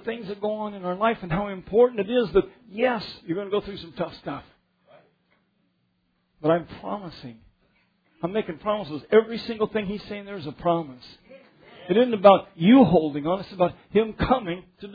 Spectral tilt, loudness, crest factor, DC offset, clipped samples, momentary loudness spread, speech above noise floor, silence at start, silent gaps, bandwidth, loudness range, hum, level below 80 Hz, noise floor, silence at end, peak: -9 dB/octave; -24 LUFS; 22 dB; under 0.1%; under 0.1%; 18 LU; 47 dB; 0.05 s; none; 5 kHz; 12 LU; none; -52 dBFS; -71 dBFS; 0 s; -2 dBFS